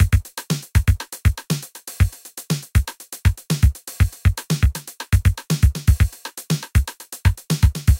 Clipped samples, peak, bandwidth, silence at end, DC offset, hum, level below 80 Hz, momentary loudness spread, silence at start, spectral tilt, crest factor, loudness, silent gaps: under 0.1%; -2 dBFS; 17 kHz; 0 s; under 0.1%; none; -22 dBFS; 8 LU; 0 s; -5 dB/octave; 16 dB; -21 LUFS; none